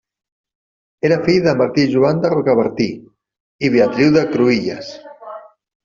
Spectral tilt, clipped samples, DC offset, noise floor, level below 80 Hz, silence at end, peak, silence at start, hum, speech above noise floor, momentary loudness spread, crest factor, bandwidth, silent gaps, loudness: -7 dB/octave; under 0.1%; under 0.1%; -35 dBFS; -54 dBFS; 0.45 s; -2 dBFS; 1.05 s; none; 21 dB; 21 LU; 14 dB; 7.4 kHz; 3.40-3.59 s; -15 LUFS